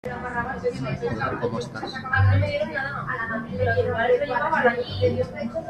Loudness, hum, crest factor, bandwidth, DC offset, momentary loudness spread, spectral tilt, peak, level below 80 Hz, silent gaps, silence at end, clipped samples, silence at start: -24 LUFS; none; 18 dB; 8.8 kHz; under 0.1%; 8 LU; -7 dB/octave; -8 dBFS; -48 dBFS; none; 0 s; under 0.1%; 0.05 s